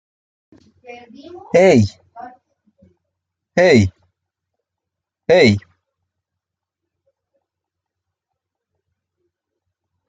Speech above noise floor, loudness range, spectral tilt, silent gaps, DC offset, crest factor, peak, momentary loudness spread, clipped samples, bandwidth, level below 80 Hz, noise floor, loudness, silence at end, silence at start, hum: 69 dB; 3 LU; -6 dB/octave; none; under 0.1%; 20 dB; -2 dBFS; 12 LU; under 0.1%; 9.2 kHz; -58 dBFS; -83 dBFS; -14 LUFS; 4.5 s; 0.9 s; none